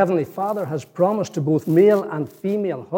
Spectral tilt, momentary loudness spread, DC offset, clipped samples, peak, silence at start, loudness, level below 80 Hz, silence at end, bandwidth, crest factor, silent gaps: -8 dB/octave; 11 LU; under 0.1%; under 0.1%; -4 dBFS; 0 s; -20 LUFS; -74 dBFS; 0 s; 17 kHz; 16 dB; none